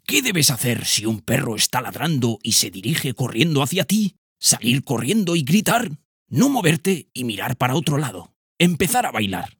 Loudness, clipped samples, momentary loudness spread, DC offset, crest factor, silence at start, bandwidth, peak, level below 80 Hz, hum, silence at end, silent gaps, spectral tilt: -20 LUFS; under 0.1%; 8 LU; under 0.1%; 20 dB; 0.1 s; over 20 kHz; 0 dBFS; -56 dBFS; none; 0.1 s; 4.18-4.36 s, 6.05-6.26 s, 8.36-8.56 s; -3.5 dB/octave